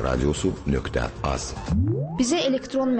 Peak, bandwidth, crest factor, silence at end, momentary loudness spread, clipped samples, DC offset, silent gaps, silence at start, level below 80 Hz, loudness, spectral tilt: -10 dBFS; 8.8 kHz; 14 dB; 0 s; 5 LU; under 0.1%; under 0.1%; none; 0 s; -34 dBFS; -25 LUFS; -5.5 dB/octave